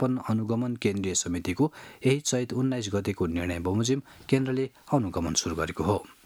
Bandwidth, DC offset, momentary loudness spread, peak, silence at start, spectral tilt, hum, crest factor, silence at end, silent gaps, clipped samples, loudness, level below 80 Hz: 17 kHz; under 0.1%; 3 LU; -8 dBFS; 0 s; -5 dB/octave; none; 20 dB; 0.15 s; none; under 0.1%; -28 LUFS; -52 dBFS